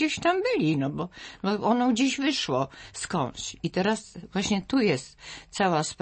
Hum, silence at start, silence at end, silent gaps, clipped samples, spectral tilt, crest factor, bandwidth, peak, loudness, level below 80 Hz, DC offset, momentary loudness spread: none; 0 s; 0.1 s; none; under 0.1%; -4.5 dB/octave; 16 dB; 8.8 kHz; -12 dBFS; -27 LUFS; -58 dBFS; under 0.1%; 11 LU